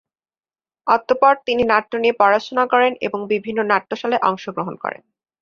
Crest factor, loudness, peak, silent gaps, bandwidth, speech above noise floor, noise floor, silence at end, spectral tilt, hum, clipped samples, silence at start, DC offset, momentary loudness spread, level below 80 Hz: 18 dB; -18 LUFS; -2 dBFS; none; 7 kHz; over 72 dB; under -90 dBFS; 0.5 s; -5.5 dB/octave; none; under 0.1%; 0.85 s; under 0.1%; 11 LU; -58 dBFS